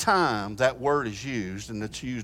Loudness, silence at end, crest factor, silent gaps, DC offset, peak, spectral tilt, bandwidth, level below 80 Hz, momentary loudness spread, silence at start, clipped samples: -27 LUFS; 0 s; 20 dB; none; under 0.1%; -8 dBFS; -4.5 dB/octave; 16.5 kHz; -52 dBFS; 11 LU; 0 s; under 0.1%